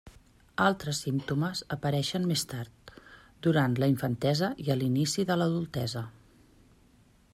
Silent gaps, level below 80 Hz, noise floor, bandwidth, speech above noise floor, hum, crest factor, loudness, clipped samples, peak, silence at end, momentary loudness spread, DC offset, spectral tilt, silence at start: none; -60 dBFS; -61 dBFS; 15.5 kHz; 33 dB; none; 20 dB; -29 LUFS; under 0.1%; -10 dBFS; 1.2 s; 10 LU; under 0.1%; -5.5 dB/octave; 0.05 s